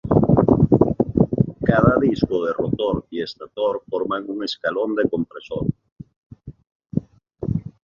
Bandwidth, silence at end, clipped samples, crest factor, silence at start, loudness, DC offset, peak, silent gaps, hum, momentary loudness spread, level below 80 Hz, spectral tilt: 7.2 kHz; 0.15 s; under 0.1%; 20 dB; 0.05 s; -21 LUFS; under 0.1%; 0 dBFS; 5.92-5.96 s, 6.16-6.30 s, 6.72-6.80 s; none; 13 LU; -40 dBFS; -9 dB/octave